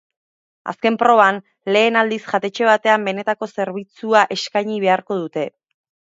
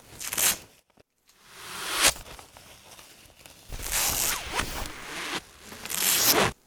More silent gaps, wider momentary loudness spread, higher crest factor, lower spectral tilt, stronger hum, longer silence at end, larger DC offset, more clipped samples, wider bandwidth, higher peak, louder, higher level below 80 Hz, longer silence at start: neither; second, 12 LU vs 23 LU; second, 18 dB vs 26 dB; first, -4.5 dB/octave vs -0.5 dB/octave; neither; first, 0.6 s vs 0.15 s; neither; neither; second, 7.8 kHz vs over 20 kHz; first, 0 dBFS vs -4 dBFS; first, -18 LUFS vs -25 LUFS; second, -72 dBFS vs -46 dBFS; first, 0.65 s vs 0.1 s